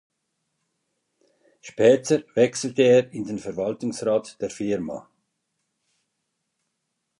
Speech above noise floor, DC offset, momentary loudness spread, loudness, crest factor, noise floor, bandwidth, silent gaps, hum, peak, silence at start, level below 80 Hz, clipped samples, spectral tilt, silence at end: 56 dB; under 0.1%; 14 LU; -22 LUFS; 20 dB; -78 dBFS; 11.5 kHz; none; none; -6 dBFS; 1.65 s; -66 dBFS; under 0.1%; -5 dB/octave; 2.2 s